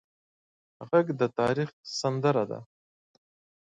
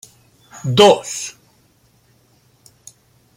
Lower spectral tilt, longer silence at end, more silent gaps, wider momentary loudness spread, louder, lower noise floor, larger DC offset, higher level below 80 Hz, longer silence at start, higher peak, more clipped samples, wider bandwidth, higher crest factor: first, -6 dB/octave vs -4 dB/octave; second, 1 s vs 2.05 s; first, 1.73-1.84 s vs none; second, 8 LU vs 18 LU; second, -28 LUFS vs -15 LUFS; first, under -90 dBFS vs -56 dBFS; neither; second, -68 dBFS vs -60 dBFS; first, 0.8 s vs 0.55 s; second, -10 dBFS vs 0 dBFS; neither; second, 9.6 kHz vs 16.5 kHz; about the same, 20 dB vs 20 dB